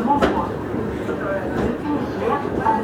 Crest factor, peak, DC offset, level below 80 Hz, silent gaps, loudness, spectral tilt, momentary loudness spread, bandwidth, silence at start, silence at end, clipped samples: 18 dB; -2 dBFS; under 0.1%; -40 dBFS; none; -22 LUFS; -7 dB/octave; 6 LU; 16.5 kHz; 0 s; 0 s; under 0.1%